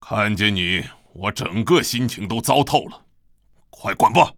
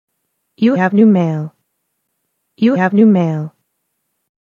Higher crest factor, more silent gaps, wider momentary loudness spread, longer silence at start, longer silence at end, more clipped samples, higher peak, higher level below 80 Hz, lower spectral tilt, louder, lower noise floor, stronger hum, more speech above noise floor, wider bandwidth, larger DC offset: about the same, 20 dB vs 16 dB; neither; second, 10 LU vs 13 LU; second, 0.05 s vs 0.6 s; second, 0 s vs 1.05 s; neither; about the same, 0 dBFS vs 0 dBFS; first, -50 dBFS vs -74 dBFS; second, -4.5 dB/octave vs -9 dB/octave; second, -20 LUFS vs -13 LUFS; second, -56 dBFS vs -70 dBFS; neither; second, 37 dB vs 58 dB; first, over 20 kHz vs 6.6 kHz; neither